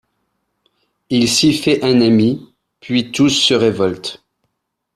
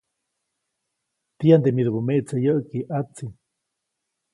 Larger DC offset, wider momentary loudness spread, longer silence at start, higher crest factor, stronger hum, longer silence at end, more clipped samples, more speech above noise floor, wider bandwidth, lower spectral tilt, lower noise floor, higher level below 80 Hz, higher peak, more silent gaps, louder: neither; second, 8 LU vs 16 LU; second, 1.1 s vs 1.4 s; about the same, 16 dB vs 20 dB; neither; second, 0.8 s vs 1 s; neither; about the same, 59 dB vs 60 dB; first, 13.5 kHz vs 11.5 kHz; second, -4.5 dB/octave vs -9 dB/octave; second, -73 dBFS vs -80 dBFS; first, -52 dBFS vs -64 dBFS; about the same, -2 dBFS vs -4 dBFS; neither; first, -14 LUFS vs -21 LUFS